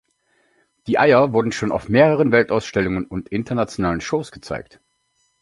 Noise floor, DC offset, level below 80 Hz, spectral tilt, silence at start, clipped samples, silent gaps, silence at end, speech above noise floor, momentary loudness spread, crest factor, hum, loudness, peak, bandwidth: -67 dBFS; under 0.1%; -46 dBFS; -6.5 dB/octave; 0.85 s; under 0.1%; none; 0.8 s; 48 dB; 16 LU; 18 dB; none; -19 LUFS; -2 dBFS; 11.5 kHz